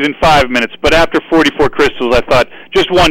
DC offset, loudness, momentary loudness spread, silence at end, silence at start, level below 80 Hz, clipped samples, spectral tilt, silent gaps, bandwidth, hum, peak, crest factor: under 0.1%; -11 LUFS; 4 LU; 0 s; 0 s; -28 dBFS; under 0.1%; -4.5 dB/octave; none; 16.5 kHz; none; -2 dBFS; 8 dB